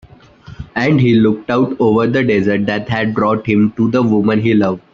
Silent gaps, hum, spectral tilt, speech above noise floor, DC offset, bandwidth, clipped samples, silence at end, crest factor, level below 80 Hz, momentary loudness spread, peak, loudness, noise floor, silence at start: none; none; -8.5 dB/octave; 25 dB; under 0.1%; 7 kHz; under 0.1%; 0.15 s; 14 dB; -46 dBFS; 6 LU; 0 dBFS; -14 LUFS; -38 dBFS; 0.5 s